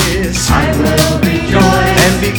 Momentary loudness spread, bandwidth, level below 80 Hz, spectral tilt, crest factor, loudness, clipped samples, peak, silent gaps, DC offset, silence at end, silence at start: 4 LU; over 20 kHz; -22 dBFS; -4.5 dB/octave; 10 dB; -11 LUFS; 0.1%; 0 dBFS; none; under 0.1%; 0 s; 0 s